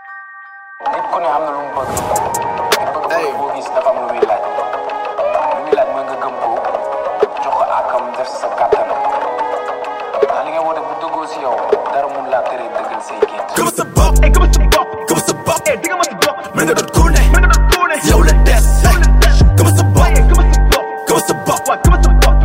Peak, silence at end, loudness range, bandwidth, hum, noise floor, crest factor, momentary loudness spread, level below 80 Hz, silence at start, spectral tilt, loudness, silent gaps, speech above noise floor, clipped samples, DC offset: 0 dBFS; 0 s; 7 LU; 16.5 kHz; none; -34 dBFS; 12 dB; 10 LU; -16 dBFS; 0 s; -5 dB/octave; -14 LUFS; none; 20 dB; under 0.1%; under 0.1%